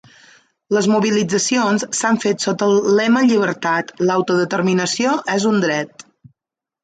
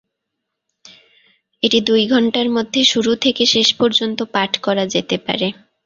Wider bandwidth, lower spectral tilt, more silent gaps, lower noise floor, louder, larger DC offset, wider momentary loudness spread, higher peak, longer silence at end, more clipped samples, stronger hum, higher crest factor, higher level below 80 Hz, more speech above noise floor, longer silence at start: first, 9.4 kHz vs 7.6 kHz; about the same, -4.5 dB/octave vs -3.5 dB/octave; neither; first, -87 dBFS vs -78 dBFS; about the same, -17 LUFS vs -16 LUFS; neither; about the same, 5 LU vs 7 LU; second, -4 dBFS vs 0 dBFS; first, 0.95 s vs 0.35 s; neither; neither; about the same, 14 dB vs 18 dB; second, -64 dBFS vs -58 dBFS; first, 71 dB vs 61 dB; second, 0.7 s vs 1.65 s